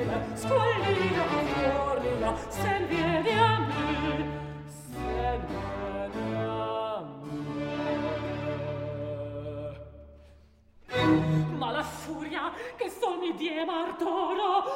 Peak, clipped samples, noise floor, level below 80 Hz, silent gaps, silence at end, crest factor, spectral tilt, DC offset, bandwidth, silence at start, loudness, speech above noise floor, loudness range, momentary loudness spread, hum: -8 dBFS; under 0.1%; -57 dBFS; -48 dBFS; none; 0 s; 20 dB; -6 dB/octave; under 0.1%; 16 kHz; 0 s; -30 LUFS; 30 dB; 7 LU; 12 LU; none